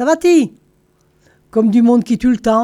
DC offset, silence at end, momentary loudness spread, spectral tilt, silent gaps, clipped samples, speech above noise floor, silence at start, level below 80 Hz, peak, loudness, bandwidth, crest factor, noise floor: under 0.1%; 0 s; 7 LU; -6 dB/octave; none; under 0.1%; 44 dB; 0 s; -46 dBFS; -2 dBFS; -13 LUFS; 12.5 kHz; 12 dB; -56 dBFS